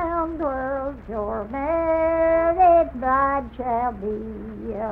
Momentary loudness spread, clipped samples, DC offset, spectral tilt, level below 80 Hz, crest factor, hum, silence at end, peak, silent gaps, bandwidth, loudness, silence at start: 13 LU; under 0.1%; under 0.1%; -9.5 dB/octave; -40 dBFS; 14 dB; none; 0 s; -8 dBFS; none; 3.9 kHz; -22 LUFS; 0 s